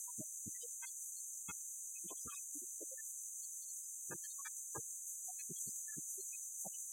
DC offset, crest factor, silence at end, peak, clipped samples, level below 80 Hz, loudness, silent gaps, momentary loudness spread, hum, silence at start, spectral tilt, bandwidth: under 0.1%; 18 dB; 0 s; -30 dBFS; under 0.1%; -84 dBFS; -45 LUFS; none; 2 LU; none; 0 s; -1 dB/octave; 16.5 kHz